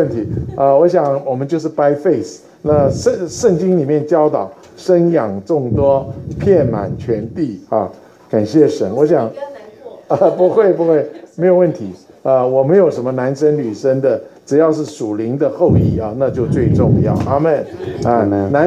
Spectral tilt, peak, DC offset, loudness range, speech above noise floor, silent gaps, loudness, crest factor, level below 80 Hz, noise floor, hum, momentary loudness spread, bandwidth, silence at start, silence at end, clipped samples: -8 dB/octave; 0 dBFS; under 0.1%; 2 LU; 21 dB; none; -15 LUFS; 14 dB; -40 dBFS; -35 dBFS; none; 10 LU; 10 kHz; 0 s; 0 s; under 0.1%